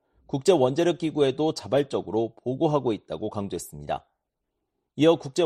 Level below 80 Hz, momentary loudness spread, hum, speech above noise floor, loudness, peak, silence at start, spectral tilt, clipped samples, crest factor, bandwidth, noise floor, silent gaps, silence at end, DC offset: -60 dBFS; 12 LU; none; 56 dB; -25 LUFS; -6 dBFS; 0.35 s; -6 dB/octave; under 0.1%; 18 dB; 13 kHz; -81 dBFS; none; 0 s; under 0.1%